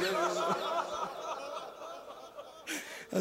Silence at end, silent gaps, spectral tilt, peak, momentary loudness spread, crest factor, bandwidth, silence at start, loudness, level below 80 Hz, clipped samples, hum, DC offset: 0 s; none; -3.5 dB/octave; -18 dBFS; 16 LU; 18 dB; 16 kHz; 0 s; -36 LUFS; -76 dBFS; under 0.1%; none; under 0.1%